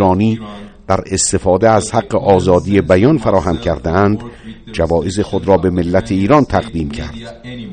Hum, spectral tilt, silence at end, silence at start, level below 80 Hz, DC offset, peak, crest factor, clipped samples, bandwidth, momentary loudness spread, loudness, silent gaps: none; -6 dB/octave; 0 s; 0 s; -34 dBFS; under 0.1%; 0 dBFS; 14 dB; 0.1%; 9.6 kHz; 16 LU; -14 LUFS; none